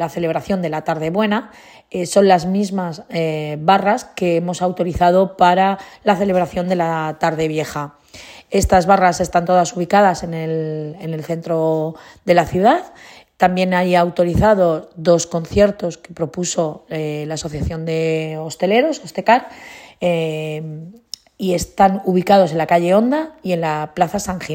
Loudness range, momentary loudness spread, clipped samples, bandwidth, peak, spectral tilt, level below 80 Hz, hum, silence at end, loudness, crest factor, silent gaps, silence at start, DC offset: 3 LU; 12 LU; under 0.1%; 16.5 kHz; 0 dBFS; -5.5 dB/octave; -40 dBFS; none; 0 s; -17 LUFS; 16 dB; none; 0 s; under 0.1%